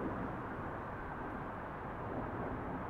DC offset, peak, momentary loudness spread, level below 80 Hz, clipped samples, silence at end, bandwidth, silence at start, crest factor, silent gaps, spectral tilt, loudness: under 0.1%; -28 dBFS; 3 LU; -54 dBFS; under 0.1%; 0 s; 15.5 kHz; 0 s; 14 dB; none; -9 dB/octave; -43 LUFS